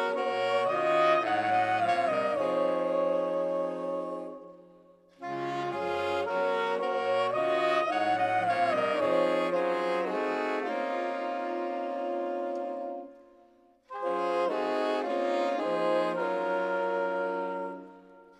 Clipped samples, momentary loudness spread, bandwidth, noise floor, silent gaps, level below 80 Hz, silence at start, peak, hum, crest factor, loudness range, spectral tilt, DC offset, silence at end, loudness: under 0.1%; 9 LU; 10.5 kHz; -61 dBFS; none; -78 dBFS; 0 s; -14 dBFS; none; 16 dB; 6 LU; -5.5 dB/octave; under 0.1%; 0.15 s; -29 LUFS